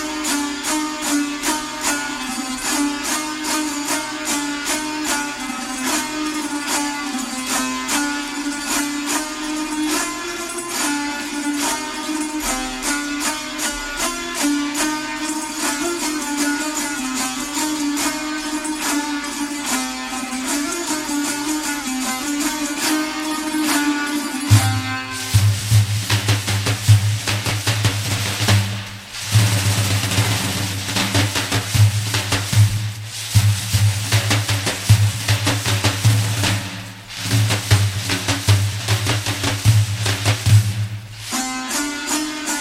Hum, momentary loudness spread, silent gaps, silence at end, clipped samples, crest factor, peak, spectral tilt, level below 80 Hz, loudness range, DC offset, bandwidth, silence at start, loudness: none; 7 LU; none; 0 s; under 0.1%; 20 dB; 0 dBFS; -3.5 dB/octave; -44 dBFS; 4 LU; under 0.1%; 16.5 kHz; 0 s; -20 LUFS